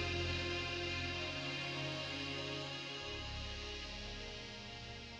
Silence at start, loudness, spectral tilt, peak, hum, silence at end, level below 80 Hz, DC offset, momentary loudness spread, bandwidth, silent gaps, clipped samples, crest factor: 0 s; -41 LUFS; -4 dB/octave; -26 dBFS; none; 0 s; -54 dBFS; under 0.1%; 9 LU; 10.5 kHz; none; under 0.1%; 16 dB